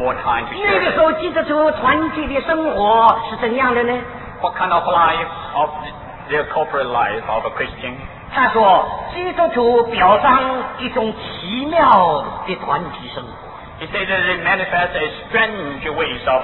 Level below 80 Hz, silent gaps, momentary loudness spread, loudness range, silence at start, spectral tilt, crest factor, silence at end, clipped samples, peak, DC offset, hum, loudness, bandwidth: -42 dBFS; none; 13 LU; 4 LU; 0 s; -8 dB/octave; 18 dB; 0 s; under 0.1%; 0 dBFS; under 0.1%; none; -17 LUFS; 4.9 kHz